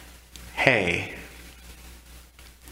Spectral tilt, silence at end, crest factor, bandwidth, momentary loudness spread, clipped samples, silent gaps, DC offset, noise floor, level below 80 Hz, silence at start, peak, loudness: -4.5 dB/octave; 0 s; 28 dB; 16 kHz; 26 LU; under 0.1%; none; under 0.1%; -49 dBFS; -48 dBFS; 0 s; 0 dBFS; -23 LUFS